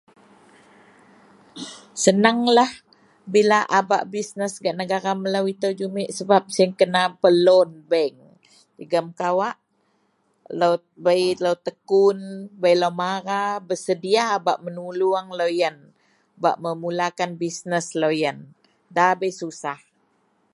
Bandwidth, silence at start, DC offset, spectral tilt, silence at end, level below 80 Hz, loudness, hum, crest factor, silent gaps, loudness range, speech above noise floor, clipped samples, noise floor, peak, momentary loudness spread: 11.5 kHz; 1.55 s; under 0.1%; -4.5 dB/octave; 0.8 s; -74 dBFS; -21 LUFS; none; 22 dB; none; 5 LU; 46 dB; under 0.1%; -67 dBFS; 0 dBFS; 11 LU